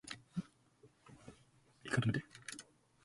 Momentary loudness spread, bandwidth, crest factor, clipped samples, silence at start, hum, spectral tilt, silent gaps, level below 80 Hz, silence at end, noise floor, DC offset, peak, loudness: 24 LU; 11.5 kHz; 22 dB; under 0.1%; 0.05 s; none; -5.5 dB/octave; none; -70 dBFS; 0.45 s; -69 dBFS; under 0.1%; -22 dBFS; -41 LUFS